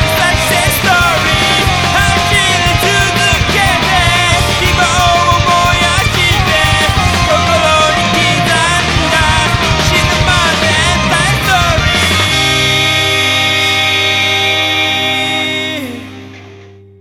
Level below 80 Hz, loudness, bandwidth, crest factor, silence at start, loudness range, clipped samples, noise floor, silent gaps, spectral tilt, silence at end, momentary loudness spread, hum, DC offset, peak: -24 dBFS; -9 LUFS; over 20 kHz; 10 dB; 0 s; 1 LU; under 0.1%; -36 dBFS; none; -3 dB/octave; 0.3 s; 2 LU; none; under 0.1%; 0 dBFS